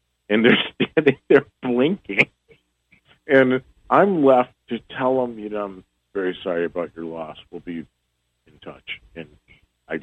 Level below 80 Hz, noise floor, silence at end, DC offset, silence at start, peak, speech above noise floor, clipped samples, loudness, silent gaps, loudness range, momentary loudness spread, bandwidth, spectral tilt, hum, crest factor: -60 dBFS; -72 dBFS; 0 s; under 0.1%; 0.3 s; -2 dBFS; 52 dB; under 0.1%; -20 LUFS; none; 11 LU; 18 LU; 7.8 kHz; -7.5 dB/octave; none; 20 dB